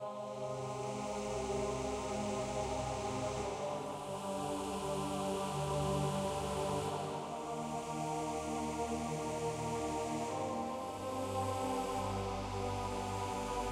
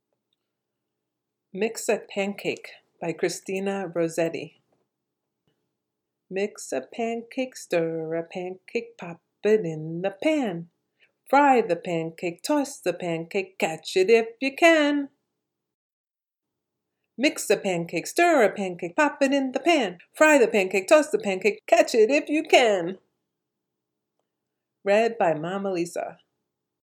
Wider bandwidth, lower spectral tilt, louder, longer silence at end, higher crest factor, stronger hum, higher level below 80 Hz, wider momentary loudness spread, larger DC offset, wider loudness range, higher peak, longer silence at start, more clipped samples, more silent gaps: second, 16 kHz vs 18.5 kHz; about the same, -5 dB/octave vs -4 dB/octave; second, -39 LUFS vs -24 LUFS; second, 0 s vs 0.85 s; second, 14 dB vs 22 dB; neither; first, -54 dBFS vs -84 dBFS; second, 4 LU vs 14 LU; neither; second, 1 LU vs 10 LU; second, -24 dBFS vs -2 dBFS; second, 0 s vs 1.55 s; neither; second, none vs 15.74-16.04 s